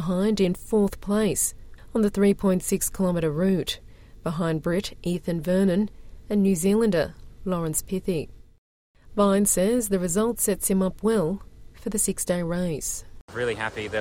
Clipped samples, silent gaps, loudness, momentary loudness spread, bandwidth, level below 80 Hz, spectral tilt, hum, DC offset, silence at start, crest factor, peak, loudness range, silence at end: under 0.1%; 8.58-8.94 s, 13.21-13.28 s; -25 LUFS; 10 LU; 17 kHz; -44 dBFS; -5 dB/octave; none; under 0.1%; 0 s; 14 dB; -10 dBFS; 2 LU; 0 s